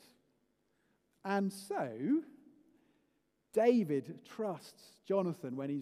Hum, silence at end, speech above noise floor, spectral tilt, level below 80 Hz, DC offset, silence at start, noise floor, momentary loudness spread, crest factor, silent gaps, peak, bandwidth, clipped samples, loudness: none; 0 s; 44 dB; -7 dB/octave; -88 dBFS; under 0.1%; 1.25 s; -78 dBFS; 15 LU; 22 dB; none; -16 dBFS; 15.5 kHz; under 0.1%; -35 LUFS